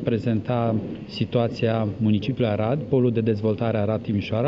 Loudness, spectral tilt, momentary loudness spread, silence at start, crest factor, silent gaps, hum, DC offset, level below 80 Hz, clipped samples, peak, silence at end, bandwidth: -24 LUFS; -9 dB/octave; 4 LU; 0 s; 18 dB; none; none; under 0.1%; -54 dBFS; under 0.1%; -6 dBFS; 0 s; 6.4 kHz